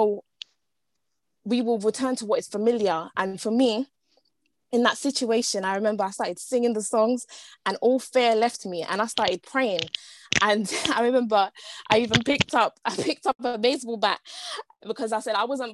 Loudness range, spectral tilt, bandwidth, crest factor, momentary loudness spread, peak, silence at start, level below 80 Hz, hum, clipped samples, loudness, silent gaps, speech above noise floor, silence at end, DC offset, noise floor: 3 LU; -3.5 dB/octave; 12.5 kHz; 22 dB; 11 LU; -2 dBFS; 0 s; -58 dBFS; none; under 0.1%; -25 LUFS; none; 58 dB; 0 s; under 0.1%; -82 dBFS